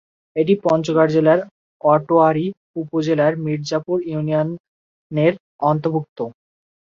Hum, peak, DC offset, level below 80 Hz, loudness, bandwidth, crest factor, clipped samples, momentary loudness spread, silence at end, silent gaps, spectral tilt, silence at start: none; -2 dBFS; under 0.1%; -62 dBFS; -19 LUFS; 7.4 kHz; 18 dB; under 0.1%; 14 LU; 0.55 s; 1.51-1.80 s, 2.57-2.74 s, 4.60-5.10 s, 5.40-5.59 s, 6.09-6.16 s; -7.5 dB/octave; 0.35 s